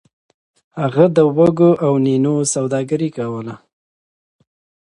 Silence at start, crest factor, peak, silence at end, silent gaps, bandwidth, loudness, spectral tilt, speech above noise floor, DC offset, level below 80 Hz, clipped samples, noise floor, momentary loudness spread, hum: 0.75 s; 16 dB; 0 dBFS; 1.3 s; none; 11.5 kHz; -16 LUFS; -6.5 dB/octave; over 75 dB; under 0.1%; -58 dBFS; under 0.1%; under -90 dBFS; 12 LU; none